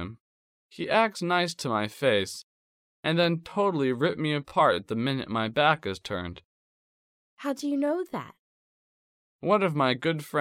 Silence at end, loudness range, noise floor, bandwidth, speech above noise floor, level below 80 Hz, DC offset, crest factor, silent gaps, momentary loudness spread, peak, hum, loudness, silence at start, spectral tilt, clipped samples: 0 s; 7 LU; under -90 dBFS; 16.5 kHz; over 63 dB; -64 dBFS; under 0.1%; 20 dB; 0.20-0.69 s, 2.43-3.03 s, 6.44-7.37 s, 8.39-9.39 s; 12 LU; -8 dBFS; none; -27 LUFS; 0 s; -5.5 dB/octave; under 0.1%